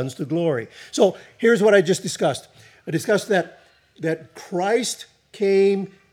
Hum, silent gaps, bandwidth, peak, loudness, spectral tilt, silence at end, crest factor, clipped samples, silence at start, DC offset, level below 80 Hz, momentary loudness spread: none; none; 15 kHz; -4 dBFS; -21 LUFS; -5 dB/octave; 0.25 s; 18 dB; under 0.1%; 0 s; under 0.1%; -72 dBFS; 14 LU